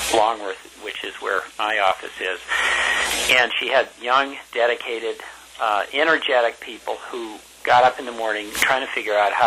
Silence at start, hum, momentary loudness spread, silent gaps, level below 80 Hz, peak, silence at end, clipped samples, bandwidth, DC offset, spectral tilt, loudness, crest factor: 0 s; none; 14 LU; none; -54 dBFS; -6 dBFS; 0 s; under 0.1%; 16 kHz; under 0.1%; -1 dB/octave; -20 LUFS; 16 dB